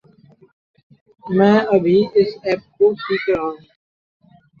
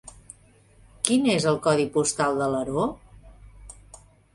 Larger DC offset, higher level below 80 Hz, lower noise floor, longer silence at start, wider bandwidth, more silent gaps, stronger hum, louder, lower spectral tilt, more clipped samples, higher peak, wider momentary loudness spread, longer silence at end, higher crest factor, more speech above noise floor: neither; about the same, -56 dBFS vs -52 dBFS; second, -50 dBFS vs -56 dBFS; first, 1.25 s vs 0.05 s; second, 6.8 kHz vs 11.5 kHz; neither; neither; first, -17 LUFS vs -24 LUFS; first, -8 dB/octave vs -4.5 dB/octave; neither; about the same, -2 dBFS vs 0 dBFS; second, 9 LU vs 17 LU; first, 1.05 s vs 0.4 s; second, 18 dB vs 26 dB; about the same, 34 dB vs 33 dB